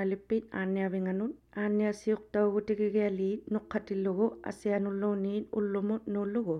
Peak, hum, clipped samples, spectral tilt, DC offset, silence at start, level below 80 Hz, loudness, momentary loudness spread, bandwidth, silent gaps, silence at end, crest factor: -16 dBFS; none; under 0.1%; -8 dB/octave; under 0.1%; 0 s; -66 dBFS; -32 LUFS; 5 LU; 10.5 kHz; none; 0 s; 14 dB